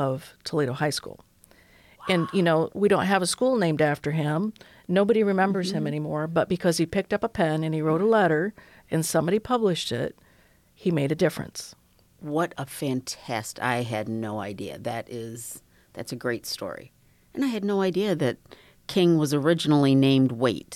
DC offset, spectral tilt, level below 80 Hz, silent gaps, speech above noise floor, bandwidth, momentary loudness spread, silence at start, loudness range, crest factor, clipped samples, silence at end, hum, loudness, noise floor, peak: under 0.1%; -5.5 dB/octave; -60 dBFS; none; 34 dB; 16.5 kHz; 15 LU; 0 s; 8 LU; 16 dB; under 0.1%; 0 s; none; -25 LUFS; -59 dBFS; -10 dBFS